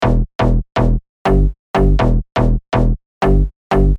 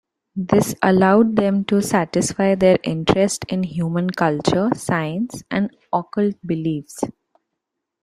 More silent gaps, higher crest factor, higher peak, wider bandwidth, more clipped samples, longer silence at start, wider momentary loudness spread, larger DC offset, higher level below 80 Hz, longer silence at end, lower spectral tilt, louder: first, 0.35-0.39 s, 1.09-1.25 s, 1.59-1.74 s, 3.06-3.21 s, 3.56-3.70 s vs none; second, 12 dB vs 18 dB; about the same, -2 dBFS vs -2 dBFS; second, 6.6 kHz vs 14 kHz; neither; second, 0 s vs 0.35 s; second, 3 LU vs 10 LU; neither; first, -16 dBFS vs -52 dBFS; second, 0 s vs 0.95 s; first, -8.5 dB/octave vs -6 dB/octave; about the same, -17 LUFS vs -19 LUFS